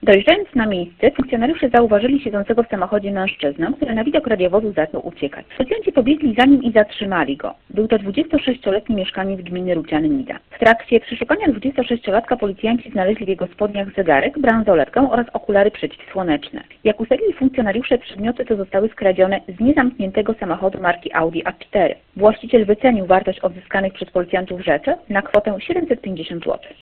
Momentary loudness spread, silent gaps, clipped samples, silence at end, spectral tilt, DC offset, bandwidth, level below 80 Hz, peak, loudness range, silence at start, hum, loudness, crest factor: 9 LU; none; under 0.1%; 0.15 s; -8 dB/octave; under 0.1%; 4.6 kHz; -44 dBFS; 0 dBFS; 3 LU; 0 s; none; -18 LUFS; 18 dB